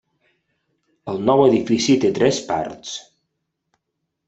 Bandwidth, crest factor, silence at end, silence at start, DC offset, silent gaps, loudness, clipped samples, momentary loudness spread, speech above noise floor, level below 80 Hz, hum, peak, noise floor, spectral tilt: 8.2 kHz; 18 dB; 1.25 s; 1.05 s; under 0.1%; none; -18 LUFS; under 0.1%; 17 LU; 59 dB; -58 dBFS; none; -2 dBFS; -77 dBFS; -5 dB/octave